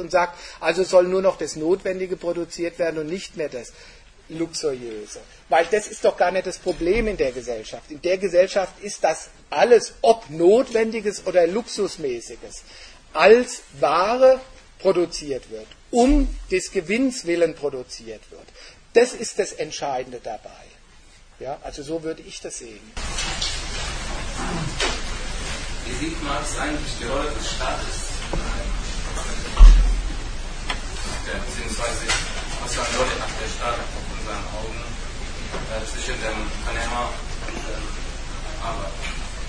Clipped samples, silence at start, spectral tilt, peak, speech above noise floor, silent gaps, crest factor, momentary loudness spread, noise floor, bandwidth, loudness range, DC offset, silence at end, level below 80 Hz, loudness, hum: under 0.1%; 0 s; -4 dB/octave; 0 dBFS; 26 dB; none; 22 dB; 16 LU; -48 dBFS; 10.5 kHz; 9 LU; under 0.1%; 0 s; -28 dBFS; -23 LUFS; none